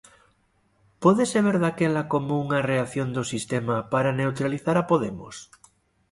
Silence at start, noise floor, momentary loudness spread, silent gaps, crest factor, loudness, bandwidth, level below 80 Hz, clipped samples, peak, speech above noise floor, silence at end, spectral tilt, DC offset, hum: 1 s; -66 dBFS; 7 LU; none; 20 dB; -24 LUFS; 11.5 kHz; -60 dBFS; under 0.1%; -4 dBFS; 42 dB; 0.65 s; -6 dB/octave; under 0.1%; none